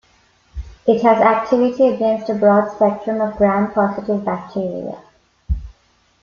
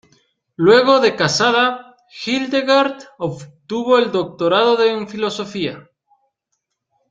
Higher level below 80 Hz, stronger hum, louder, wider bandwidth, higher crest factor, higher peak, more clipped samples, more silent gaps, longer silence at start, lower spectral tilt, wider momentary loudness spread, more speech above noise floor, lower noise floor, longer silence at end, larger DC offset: first, -36 dBFS vs -60 dBFS; neither; about the same, -17 LUFS vs -16 LUFS; second, 7 kHz vs 9.2 kHz; about the same, 16 dB vs 16 dB; about the same, -2 dBFS vs -2 dBFS; neither; neither; about the same, 0.55 s vs 0.6 s; first, -8.5 dB/octave vs -4 dB/octave; about the same, 14 LU vs 14 LU; second, 42 dB vs 58 dB; second, -58 dBFS vs -74 dBFS; second, 0.5 s vs 1.3 s; neither